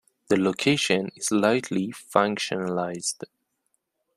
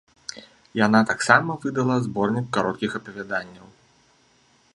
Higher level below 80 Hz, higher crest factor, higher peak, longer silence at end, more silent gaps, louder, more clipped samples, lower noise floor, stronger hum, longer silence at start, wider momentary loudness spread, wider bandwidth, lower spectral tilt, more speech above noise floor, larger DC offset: about the same, -66 dBFS vs -62 dBFS; about the same, 22 dB vs 24 dB; about the same, -2 dBFS vs 0 dBFS; second, 0.9 s vs 1.15 s; neither; second, -25 LUFS vs -22 LUFS; neither; first, -75 dBFS vs -60 dBFS; neither; about the same, 0.3 s vs 0.3 s; second, 8 LU vs 18 LU; first, 14.5 kHz vs 11 kHz; second, -4 dB/octave vs -5.5 dB/octave; first, 51 dB vs 38 dB; neither